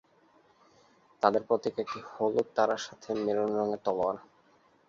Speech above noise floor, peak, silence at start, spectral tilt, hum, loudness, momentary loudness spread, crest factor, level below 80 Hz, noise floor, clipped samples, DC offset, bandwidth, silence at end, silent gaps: 35 dB; -8 dBFS; 1.2 s; -5 dB/octave; none; -31 LUFS; 8 LU; 24 dB; -72 dBFS; -64 dBFS; under 0.1%; under 0.1%; 7.6 kHz; 0.65 s; none